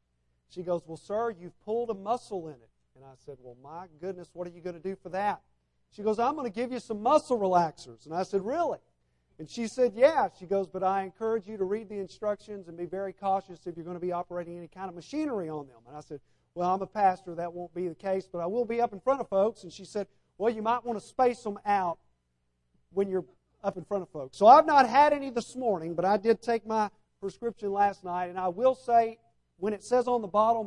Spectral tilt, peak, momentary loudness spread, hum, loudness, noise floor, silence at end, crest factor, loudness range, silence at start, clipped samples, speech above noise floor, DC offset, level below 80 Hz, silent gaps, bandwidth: -6 dB/octave; -6 dBFS; 17 LU; none; -29 LUFS; -76 dBFS; 0 s; 24 dB; 12 LU; 0.55 s; under 0.1%; 47 dB; under 0.1%; -66 dBFS; none; 11.5 kHz